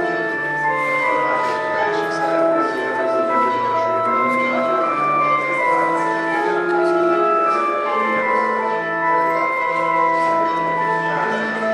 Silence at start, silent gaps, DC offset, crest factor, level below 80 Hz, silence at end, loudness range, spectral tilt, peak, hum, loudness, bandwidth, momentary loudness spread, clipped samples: 0 s; none; under 0.1%; 12 dB; -74 dBFS; 0 s; 1 LU; -5.5 dB/octave; -6 dBFS; none; -18 LUFS; 11.5 kHz; 3 LU; under 0.1%